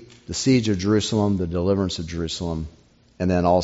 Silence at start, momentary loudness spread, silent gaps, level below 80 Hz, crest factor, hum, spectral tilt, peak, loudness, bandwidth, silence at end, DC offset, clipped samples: 0 s; 10 LU; none; -46 dBFS; 16 dB; none; -6 dB/octave; -6 dBFS; -23 LUFS; 8 kHz; 0 s; under 0.1%; under 0.1%